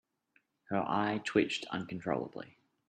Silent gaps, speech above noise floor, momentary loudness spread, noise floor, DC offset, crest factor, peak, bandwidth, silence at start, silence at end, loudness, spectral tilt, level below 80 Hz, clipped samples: none; 40 dB; 13 LU; -74 dBFS; under 0.1%; 22 dB; -14 dBFS; 9.4 kHz; 0.7 s; 0.4 s; -34 LUFS; -5.5 dB/octave; -74 dBFS; under 0.1%